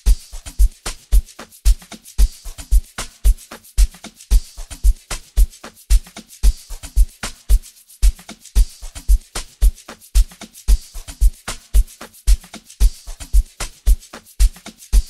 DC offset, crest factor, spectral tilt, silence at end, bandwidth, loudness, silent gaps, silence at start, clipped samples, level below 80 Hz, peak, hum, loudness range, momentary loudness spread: 0.2%; 16 dB; -4 dB/octave; 0.05 s; 13 kHz; -22 LUFS; none; 0.05 s; under 0.1%; -18 dBFS; -2 dBFS; none; 1 LU; 14 LU